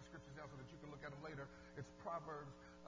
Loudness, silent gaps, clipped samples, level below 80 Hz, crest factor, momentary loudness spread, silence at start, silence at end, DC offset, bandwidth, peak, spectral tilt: -54 LUFS; none; under 0.1%; -70 dBFS; 18 dB; 7 LU; 0 s; 0 s; under 0.1%; 7.6 kHz; -36 dBFS; -6 dB/octave